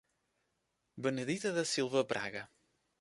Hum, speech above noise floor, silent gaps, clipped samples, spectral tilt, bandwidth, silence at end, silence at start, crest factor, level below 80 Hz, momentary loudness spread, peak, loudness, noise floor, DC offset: none; 47 dB; none; under 0.1%; -4 dB/octave; 11.5 kHz; 0.55 s; 0.95 s; 20 dB; -76 dBFS; 11 LU; -18 dBFS; -35 LUFS; -82 dBFS; under 0.1%